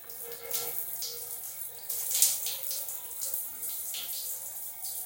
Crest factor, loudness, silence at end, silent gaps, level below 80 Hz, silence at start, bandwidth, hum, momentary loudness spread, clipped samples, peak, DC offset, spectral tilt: 30 dB; -31 LUFS; 0 s; none; -78 dBFS; 0 s; 17.5 kHz; none; 12 LU; under 0.1%; -4 dBFS; under 0.1%; 2 dB/octave